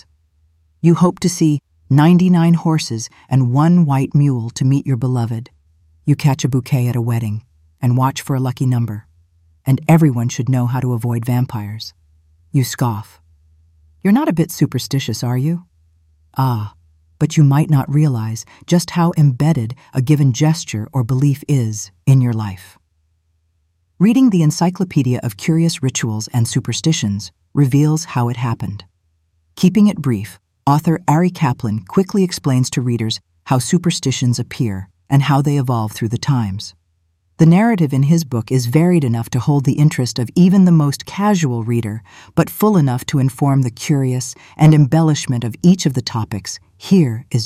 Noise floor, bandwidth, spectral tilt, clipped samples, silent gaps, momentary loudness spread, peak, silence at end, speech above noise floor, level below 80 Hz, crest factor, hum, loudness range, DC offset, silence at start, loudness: -63 dBFS; 15.5 kHz; -6.5 dB/octave; under 0.1%; none; 11 LU; -2 dBFS; 0 s; 48 dB; -52 dBFS; 14 dB; none; 5 LU; under 0.1%; 0.85 s; -16 LUFS